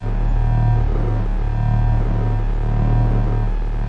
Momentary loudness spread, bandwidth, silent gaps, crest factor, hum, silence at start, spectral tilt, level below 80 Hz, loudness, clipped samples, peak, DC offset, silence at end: 5 LU; 4.3 kHz; none; 10 dB; none; 0 s; -9.5 dB/octave; -18 dBFS; -20 LUFS; under 0.1%; -6 dBFS; under 0.1%; 0 s